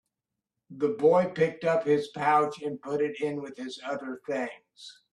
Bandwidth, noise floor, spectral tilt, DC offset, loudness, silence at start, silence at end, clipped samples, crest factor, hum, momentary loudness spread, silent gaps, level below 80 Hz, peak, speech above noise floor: 10.5 kHz; -87 dBFS; -6 dB/octave; under 0.1%; -28 LUFS; 0.7 s; 0.2 s; under 0.1%; 18 dB; none; 14 LU; none; -72 dBFS; -10 dBFS; 59 dB